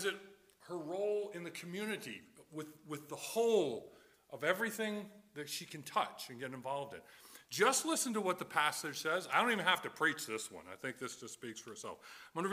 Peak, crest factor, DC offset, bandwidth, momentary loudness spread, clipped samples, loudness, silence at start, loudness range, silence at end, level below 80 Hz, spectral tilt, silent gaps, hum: -14 dBFS; 24 dB; under 0.1%; 16 kHz; 17 LU; under 0.1%; -37 LUFS; 0 s; 6 LU; 0 s; -84 dBFS; -2.5 dB/octave; none; none